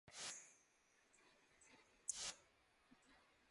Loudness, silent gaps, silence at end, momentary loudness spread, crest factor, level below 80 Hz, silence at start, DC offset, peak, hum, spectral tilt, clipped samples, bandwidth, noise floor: -50 LUFS; none; 0 s; 21 LU; 32 dB; -86 dBFS; 0.05 s; under 0.1%; -26 dBFS; none; 1 dB/octave; under 0.1%; 11.5 kHz; -78 dBFS